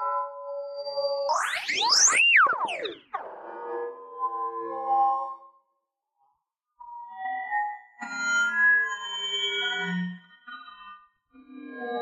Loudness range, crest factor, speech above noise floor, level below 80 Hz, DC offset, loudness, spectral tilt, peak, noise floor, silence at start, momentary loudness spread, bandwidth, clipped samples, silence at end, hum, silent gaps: 9 LU; 20 dB; 57 dB; -80 dBFS; under 0.1%; -24 LUFS; -0.5 dB/octave; -8 dBFS; -79 dBFS; 0 s; 25 LU; 15 kHz; under 0.1%; 0 s; none; none